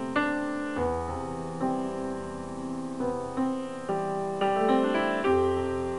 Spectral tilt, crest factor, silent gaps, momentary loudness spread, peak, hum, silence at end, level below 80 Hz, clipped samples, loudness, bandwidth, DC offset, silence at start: -6 dB/octave; 18 dB; none; 10 LU; -12 dBFS; none; 0 s; -52 dBFS; under 0.1%; -29 LUFS; 11.5 kHz; 0.4%; 0 s